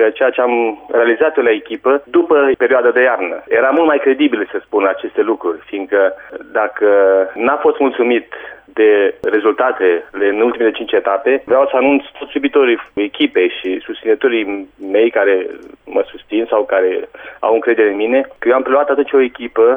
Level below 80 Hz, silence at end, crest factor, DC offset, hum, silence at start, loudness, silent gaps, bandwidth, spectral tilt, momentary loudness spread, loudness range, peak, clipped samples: -58 dBFS; 0 s; 12 dB; under 0.1%; none; 0 s; -14 LUFS; none; 3.7 kHz; -7 dB/octave; 9 LU; 3 LU; -2 dBFS; under 0.1%